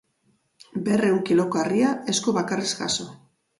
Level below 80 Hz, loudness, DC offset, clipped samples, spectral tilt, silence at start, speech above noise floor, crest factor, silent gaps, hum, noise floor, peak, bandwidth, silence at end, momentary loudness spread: -64 dBFS; -23 LUFS; under 0.1%; under 0.1%; -4 dB/octave; 0.75 s; 45 dB; 14 dB; none; none; -67 dBFS; -10 dBFS; 11.5 kHz; 0.45 s; 8 LU